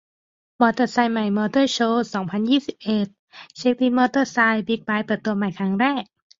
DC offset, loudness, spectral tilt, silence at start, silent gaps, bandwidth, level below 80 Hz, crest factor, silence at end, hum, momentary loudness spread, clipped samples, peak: under 0.1%; -21 LUFS; -5.5 dB/octave; 0.6 s; 3.19-3.28 s; 7.6 kHz; -64 dBFS; 18 dB; 0.35 s; none; 6 LU; under 0.1%; -4 dBFS